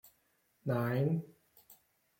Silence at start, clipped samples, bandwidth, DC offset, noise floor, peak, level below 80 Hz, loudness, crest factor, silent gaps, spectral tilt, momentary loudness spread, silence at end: 0.65 s; under 0.1%; 16.5 kHz; under 0.1%; -75 dBFS; -20 dBFS; -74 dBFS; -35 LUFS; 16 dB; none; -8.5 dB/octave; 13 LU; 0.45 s